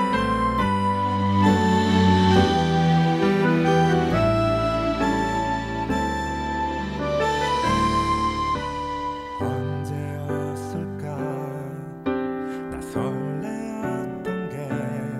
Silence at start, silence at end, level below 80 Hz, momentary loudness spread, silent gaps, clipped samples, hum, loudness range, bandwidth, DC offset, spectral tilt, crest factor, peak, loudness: 0 s; 0 s; -40 dBFS; 11 LU; none; under 0.1%; none; 10 LU; 13.5 kHz; under 0.1%; -6.5 dB/octave; 18 dB; -6 dBFS; -23 LUFS